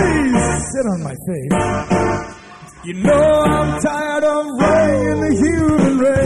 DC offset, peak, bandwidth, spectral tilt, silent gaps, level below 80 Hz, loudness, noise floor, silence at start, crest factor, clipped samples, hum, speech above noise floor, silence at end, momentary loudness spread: 0.6%; -4 dBFS; 13.5 kHz; -6 dB/octave; none; -34 dBFS; -16 LUFS; -38 dBFS; 0 s; 10 dB; under 0.1%; none; 23 dB; 0 s; 11 LU